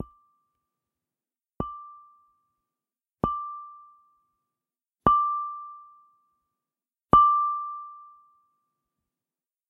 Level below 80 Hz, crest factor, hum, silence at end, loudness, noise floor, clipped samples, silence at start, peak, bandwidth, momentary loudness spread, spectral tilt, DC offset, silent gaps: -52 dBFS; 28 dB; none; 1.65 s; -24 LUFS; under -90 dBFS; under 0.1%; 0 s; -2 dBFS; 3.7 kHz; 25 LU; -9.5 dB/octave; under 0.1%; none